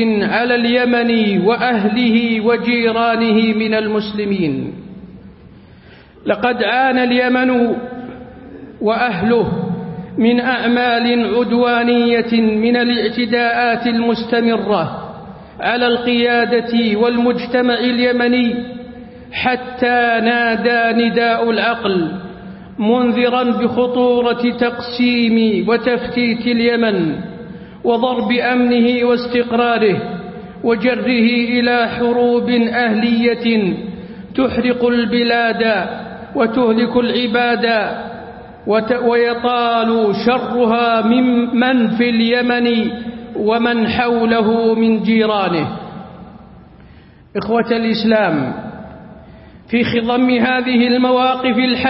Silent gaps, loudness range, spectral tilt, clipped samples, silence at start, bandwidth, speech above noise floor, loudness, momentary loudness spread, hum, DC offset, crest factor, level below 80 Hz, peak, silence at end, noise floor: none; 3 LU; -10.5 dB/octave; under 0.1%; 0 s; 5.8 kHz; 28 dB; -15 LUFS; 13 LU; none; under 0.1%; 14 dB; -48 dBFS; -2 dBFS; 0 s; -42 dBFS